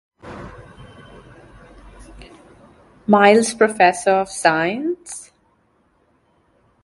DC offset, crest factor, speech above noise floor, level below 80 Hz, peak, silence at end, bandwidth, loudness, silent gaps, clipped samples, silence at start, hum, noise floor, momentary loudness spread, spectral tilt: under 0.1%; 20 dB; 45 dB; -52 dBFS; 0 dBFS; 1.6 s; 11.5 kHz; -16 LUFS; none; under 0.1%; 0.25 s; none; -61 dBFS; 24 LU; -4 dB/octave